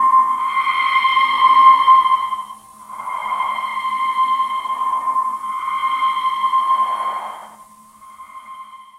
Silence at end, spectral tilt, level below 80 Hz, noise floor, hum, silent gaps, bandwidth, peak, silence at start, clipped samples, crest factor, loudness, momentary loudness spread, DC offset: 0.15 s; -0.5 dB/octave; -64 dBFS; -44 dBFS; none; none; 13.5 kHz; 0 dBFS; 0 s; under 0.1%; 18 dB; -16 LUFS; 22 LU; under 0.1%